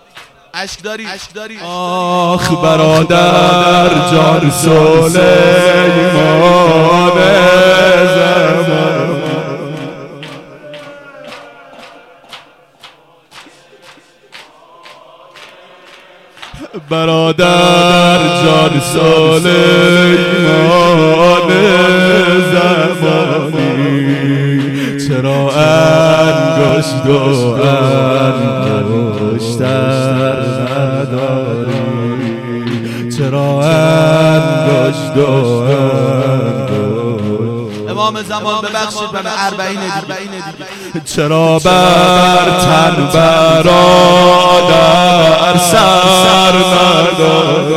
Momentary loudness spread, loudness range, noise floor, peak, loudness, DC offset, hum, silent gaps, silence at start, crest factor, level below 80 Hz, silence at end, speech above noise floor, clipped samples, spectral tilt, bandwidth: 13 LU; 9 LU; -42 dBFS; 0 dBFS; -9 LUFS; under 0.1%; none; none; 0.15 s; 10 dB; -40 dBFS; 0 s; 33 dB; under 0.1%; -5 dB/octave; 16 kHz